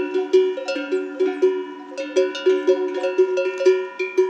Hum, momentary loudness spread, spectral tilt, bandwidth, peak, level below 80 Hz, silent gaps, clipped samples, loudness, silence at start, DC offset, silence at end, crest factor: none; 7 LU; -2.5 dB/octave; 8.2 kHz; -6 dBFS; under -90 dBFS; none; under 0.1%; -21 LUFS; 0 s; under 0.1%; 0 s; 14 dB